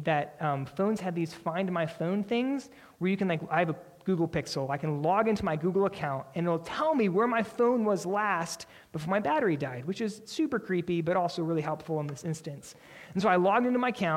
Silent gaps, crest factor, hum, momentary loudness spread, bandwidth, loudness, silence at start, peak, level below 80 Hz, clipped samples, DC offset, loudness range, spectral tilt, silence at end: none; 18 dB; none; 10 LU; 16 kHz; -30 LUFS; 0 s; -12 dBFS; -64 dBFS; under 0.1%; under 0.1%; 3 LU; -6.5 dB/octave; 0 s